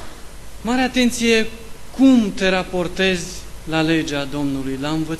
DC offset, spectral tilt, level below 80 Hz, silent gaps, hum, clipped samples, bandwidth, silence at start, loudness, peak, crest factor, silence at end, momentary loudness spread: under 0.1%; -4.5 dB/octave; -38 dBFS; none; none; under 0.1%; 13 kHz; 0 s; -19 LUFS; -2 dBFS; 16 dB; 0 s; 16 LU